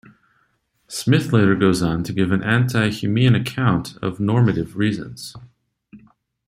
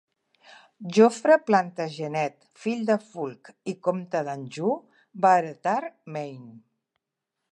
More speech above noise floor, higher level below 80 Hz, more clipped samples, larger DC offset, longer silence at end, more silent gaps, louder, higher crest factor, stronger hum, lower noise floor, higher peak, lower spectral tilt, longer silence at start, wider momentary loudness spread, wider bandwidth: second, 47 dB vs 59 dB; first, -50 dBFS vs -82 dBFS; neither; neither; second, 0.5 s vs 0.95 s; neither; first, -19 LUFS vs -25 LUFS; about the same, 18 dB vs 20 dB; neither; second, -66 dBFS vs -84 dBFS; first, -2 dBFS vs -6 dBFS; about the same, -6.5 dB/octave vs -6 dB/octave; about the same, 0.9 s vs 0.8 s; second, 12 LU vs 16 LU; first, 15 kHz vs 11.5 kHz